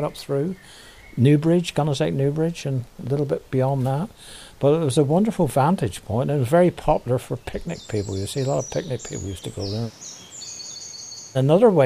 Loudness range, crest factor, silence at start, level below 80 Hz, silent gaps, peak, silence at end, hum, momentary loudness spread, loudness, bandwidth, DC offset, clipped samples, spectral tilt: 7 LU; 18 dB; 0 s; -46 dBFS; none; -4 dBFS; 0 s; none; 15 LU; -22 LUFS; 15.5 kHz; under 0.1%; under 0.1%; -6.5 dB/octave